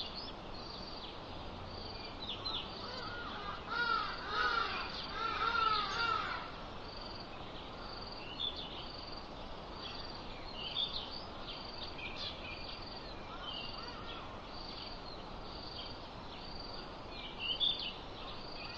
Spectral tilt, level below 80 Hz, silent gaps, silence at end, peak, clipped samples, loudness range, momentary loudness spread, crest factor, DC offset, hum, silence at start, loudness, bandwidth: -4 dB/octave; -54 dBFS; none; 0 s; -20 dBFS; under 0.1%; 9 LU; 13 LU; 20 dB; under 0.1%; none; 0 s; -40 LUFS; 8 kHz